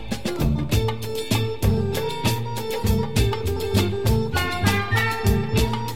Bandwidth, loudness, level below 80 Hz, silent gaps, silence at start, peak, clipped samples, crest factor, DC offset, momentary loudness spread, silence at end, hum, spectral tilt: 16.5 kHz; -23 LUFS; -30 dBFS; none; 0 s; -6 dBFS; under 0.1%; 16 dB; 2%; 5 LU; 0 s; none; -5.5 dB/octave